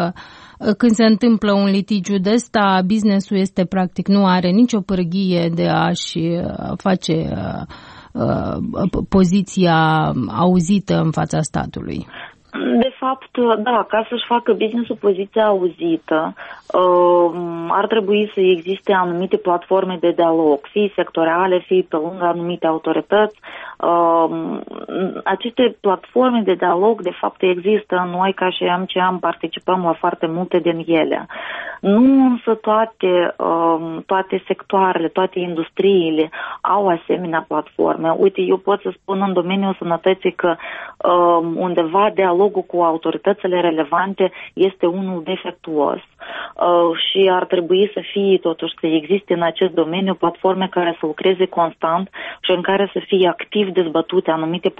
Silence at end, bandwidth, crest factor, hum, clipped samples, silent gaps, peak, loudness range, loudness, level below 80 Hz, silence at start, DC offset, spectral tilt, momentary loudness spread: 0.1 s; 8.4 kHz; 14 dB; none; under 0.1%; none; -4 dBFS; 3 LU; -17 LUFS; -48 dBFS; 0 s; under 0.1%; -6.5 dB/octave; 8 LU